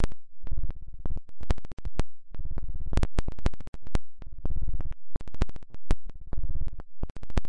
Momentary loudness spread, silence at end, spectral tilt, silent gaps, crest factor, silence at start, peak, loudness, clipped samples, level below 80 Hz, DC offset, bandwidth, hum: 10 LU; 0 s; -6.5 dB/octave; 1.73-1.77 s, 3.68-3.73 s, 7.10-7.15 s; 12 dB; 0 s; -12 dBFS; -37 LUFS; under 0.1%; -32 dBFS; under 0.1%; 8.6 kHz; none